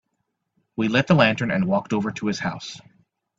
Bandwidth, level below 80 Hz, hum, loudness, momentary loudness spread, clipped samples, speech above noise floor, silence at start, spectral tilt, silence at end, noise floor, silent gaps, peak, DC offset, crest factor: 7.8 kHz; -58 dBFS; none; -22 LUFS; 18 LU; under 0.1%; 55 dB; 0.8 s; -6 dB/octave; 0.6 s; -76 dBFS; none; -2 dBFS; under 0.1%; 22 dB